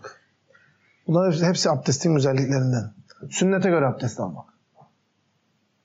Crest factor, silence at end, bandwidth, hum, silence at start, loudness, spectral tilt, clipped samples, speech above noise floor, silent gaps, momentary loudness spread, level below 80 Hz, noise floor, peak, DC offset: 16 dB; 1.4 s; 8 kHz; none; 0.05 s; -22 LUFS; -5.5 dB/octave; under 0.1%; 47 dB; none; 17 LU; -70 dBFS; -69 dBFS; -10 dBFS; under 0.1%